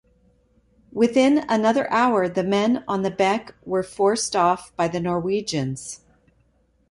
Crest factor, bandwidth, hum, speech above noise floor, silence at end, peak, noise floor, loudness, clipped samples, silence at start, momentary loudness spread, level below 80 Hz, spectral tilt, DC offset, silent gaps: 16 dB; 11.5 kHz; none; 42 dB; 0.95 s; -6 dBFS; -63 dBFS; -21 LUFS; under 0.1%; 0.95 s; 9 LU; -58 dBFS; -5 dB/octave; under 0.1%; none